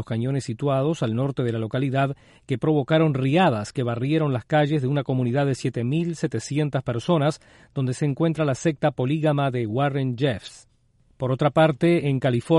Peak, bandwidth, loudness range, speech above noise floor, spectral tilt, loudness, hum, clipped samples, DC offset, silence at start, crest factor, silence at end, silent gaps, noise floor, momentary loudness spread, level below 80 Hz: -8 dBFS; 11.5 kHz; 2 LU; 39 dB; -7 dB/octave; -23 LUFS; none; under 0.1%; under 0.1%; 0 s; 16 dB; 0 s; none; -61 dBFS; 7 LU; -58 dBFS